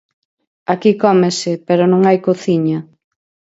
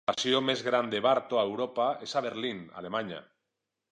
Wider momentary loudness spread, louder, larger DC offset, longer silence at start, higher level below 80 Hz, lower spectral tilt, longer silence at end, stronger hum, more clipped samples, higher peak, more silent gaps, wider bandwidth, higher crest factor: about the same, 9 LU vs 9 LU; first, -14 LUFS vs -29 LUFS; neither; first, 0.7 s vs 0.1 s; first, -62 dBFS vs -76 dBFS; first, -6.5 dB/octave vs -4 dB/octave; about the same, 0.7 s vs 0.7 s; neither; neither; first, 0 dBFS vs -12 dBFS; neither; second, 8 kHz vs 10 kHz; about the same, 16 dB vs 18 dB